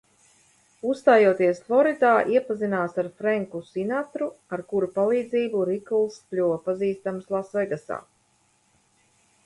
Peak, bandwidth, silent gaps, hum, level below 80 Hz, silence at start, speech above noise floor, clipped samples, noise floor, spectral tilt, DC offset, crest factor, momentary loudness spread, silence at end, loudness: -6 dBFS; 11.5 kHz; none; none; -70 dBFS; 0.85 s; 42 dB; under 0.1%; -65 dBFS; -7 dB/octave; under 0.1%; 20 dB; 12 LU; 1.45 s; -24 LUFS